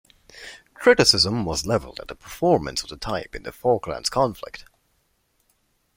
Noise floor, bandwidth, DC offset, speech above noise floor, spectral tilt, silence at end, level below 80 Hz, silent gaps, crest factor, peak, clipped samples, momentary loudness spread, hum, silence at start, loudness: -68 dBFS; 16.5 kHz; under 0.1%; 46 dB; -3.5 dB/octave; 1.35 s; -48 dBFS; none; 24 dB; -2 dBFS; under 0.1%; 24 LU; none; 0.35 s; -21 LUFS